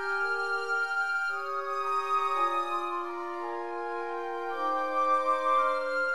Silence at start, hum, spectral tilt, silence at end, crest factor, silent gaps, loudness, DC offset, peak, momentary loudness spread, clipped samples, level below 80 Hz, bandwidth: 0 s; none; -2.5 dB/octave; 0 s; 14 dB; none; -29 LUFS; 0.5%; -16 dBFS; 9 LU; under 0.1%; -76 dBFS; 13 kHz